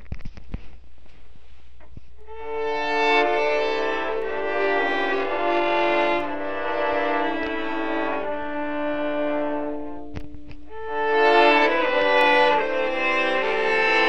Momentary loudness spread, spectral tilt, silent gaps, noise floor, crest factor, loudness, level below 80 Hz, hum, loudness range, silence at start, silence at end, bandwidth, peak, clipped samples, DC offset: 20 LU; -4.5 dB/octave; none; -48 dBFS; 18 dB; -22 LUFS; -46 dBFS; none; 8 LU; 0.05 s; 0 s; 9.4 kHz; -6 dBFS; under 0.1%; 3%